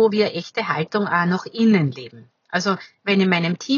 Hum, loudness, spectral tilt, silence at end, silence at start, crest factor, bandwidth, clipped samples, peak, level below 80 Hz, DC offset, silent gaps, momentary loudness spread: none; -20 LUFS; -6 dB/octave; 0 s; 0 s; 18 dB; 7.2 kHz; under 0.1%; -4 dBFS; -74 dBFS; under 0.1%; none; 9 LU